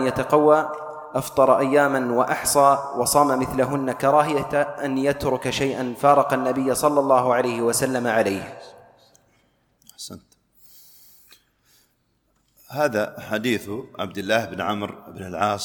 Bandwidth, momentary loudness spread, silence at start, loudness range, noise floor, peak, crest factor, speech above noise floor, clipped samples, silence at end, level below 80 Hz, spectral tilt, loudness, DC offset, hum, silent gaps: 19 kHz; 15 LU; 0 s; 10 LU; -68 dBFS; -2 dBFS; 20 dB; 47 dB; under 0.1%; 0 s; -54 dBFS; -4.5 dB/octave; -21 LUFS; under 0.1%; none; none